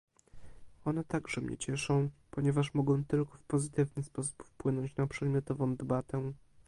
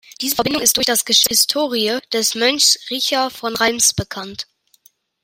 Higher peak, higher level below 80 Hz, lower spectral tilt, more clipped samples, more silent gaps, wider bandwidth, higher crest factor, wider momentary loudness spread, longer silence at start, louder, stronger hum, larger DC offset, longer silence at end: second, -18 dBFS vs 0 dBFS; second, -60 dBFS vs -52 dBFS; first, -6.5 dB/octave vs -1 dB/octave; neither; neither; second, 11.5 kHz vs 16.5 kHz; about the same, 16 dB vs 18 dB; second, 7 LU vs 14 LU; first, 0.35 s vs 0.2 s; second, -34 LUFS vs -15 LUFS; neither; neither; second, 0.35 s vs 0.8 s